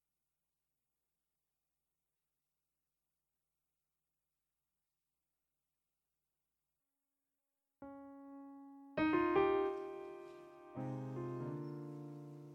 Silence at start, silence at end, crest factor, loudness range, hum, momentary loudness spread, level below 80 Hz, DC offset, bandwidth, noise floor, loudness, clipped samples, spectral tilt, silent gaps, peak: 7.8 s; 0 s; 24 dB; 20 LU; none; 22 LU; -76 dBFS; under 0.1%; 6.6 kHz; under -90 dBFS; -39 LUFS; under 0.1%; -8.5 dB/octave; none; -22 dBFS